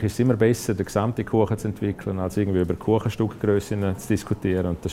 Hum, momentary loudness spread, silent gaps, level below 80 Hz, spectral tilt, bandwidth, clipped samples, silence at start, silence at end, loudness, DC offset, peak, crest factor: none; 6 LU; none; -48 dBFS; -7 dB/octave; 16 kHz; under 0.1%; 0 s; 0 s; -24 LUFS; under 0.1%; -6 dBFS; 18 dB